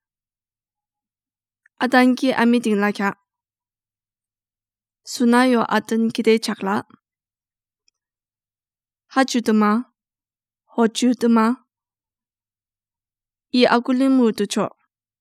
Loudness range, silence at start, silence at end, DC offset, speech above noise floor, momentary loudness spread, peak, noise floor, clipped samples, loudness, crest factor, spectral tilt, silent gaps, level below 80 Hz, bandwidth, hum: 3 LU; 1.8 s; 0.5 s; under 0.1%; over 72 dB; 9 LU; 0 dBFS; under -90 dBFS; under 0.1%; -19 LUFS; 22 dB; -4.5 dB/octave; none; -84 dBFS; 14 kHz; none